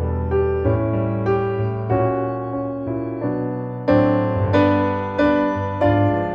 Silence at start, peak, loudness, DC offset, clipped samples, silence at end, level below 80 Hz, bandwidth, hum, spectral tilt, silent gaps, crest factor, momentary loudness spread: 0 s; -2 dBFS; -20 LUFS; under 0.1%; under 0.1%; 0 s; -36 dBFS; 6.2 kHz; none; -9.5 dB/octave; none; 16 dB; 9 LU